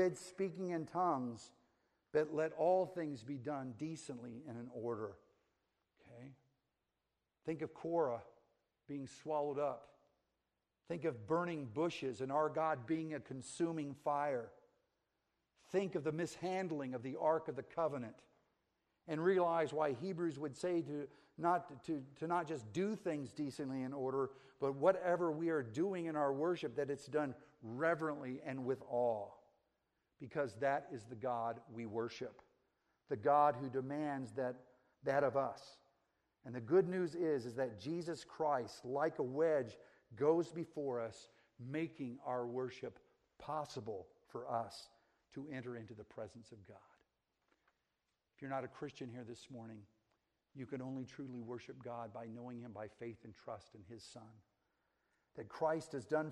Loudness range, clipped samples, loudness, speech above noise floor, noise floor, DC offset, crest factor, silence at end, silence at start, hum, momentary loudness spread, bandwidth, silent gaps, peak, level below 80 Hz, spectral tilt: 12 LU; under 0.1%; -41 LUFS; 49 dB; -89 dBFS; under 0.1%; 22 dB; 0 s; 0 s; none; 17 LU; 12 kHz; none; -18 dBFS; -82 dBFS; -6.5 dB/octave